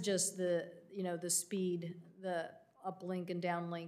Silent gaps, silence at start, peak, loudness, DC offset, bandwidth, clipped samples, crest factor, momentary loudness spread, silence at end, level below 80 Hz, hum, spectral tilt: none; 0 s; -24 dBFS; -39 LUFS; under 0.1%; 15.5 kHz; under 0.1%; 16 dB; 13 LU; 0 s; under -90 dBFS; none; -4 dB/octave